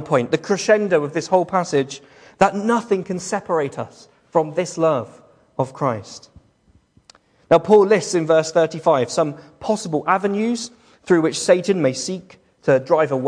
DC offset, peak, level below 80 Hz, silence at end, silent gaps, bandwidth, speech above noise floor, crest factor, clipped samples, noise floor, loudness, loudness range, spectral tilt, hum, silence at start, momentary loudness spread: under 0.1%; -2 dBFS; -62 dBFS; 0 s; none; 10.5 kHz; 39 dB; 18 dB; under 0.1%; -58 dBFS; -19 LUFS; 6 LU; -5 dB/octave; none; 0 s; 12 LU